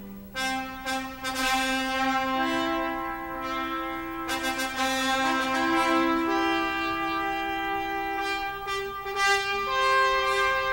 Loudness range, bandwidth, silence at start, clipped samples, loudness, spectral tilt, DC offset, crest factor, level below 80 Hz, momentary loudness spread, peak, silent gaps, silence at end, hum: 3 LU; 16 kHz; 0 s; under 0.1%; -26 LUFS; -2.5 dB/octave; under 0.1%; 18 dB; -50 dBFS; 8 LU; -10 dBFS; none; 0 s; 60 Hz at -55 dBFS